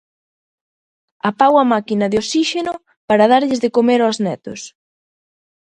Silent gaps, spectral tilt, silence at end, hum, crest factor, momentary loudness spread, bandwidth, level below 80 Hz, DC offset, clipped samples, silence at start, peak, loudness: 2.97-3.08 s; -4.5 dB/octave; 1 s; none; 18 dB; 16 LU; 10.5 kHz; -58 dBFS; under 0.1%; under 0.1%; 1.25 s; 0 dBFS; -16 LUFS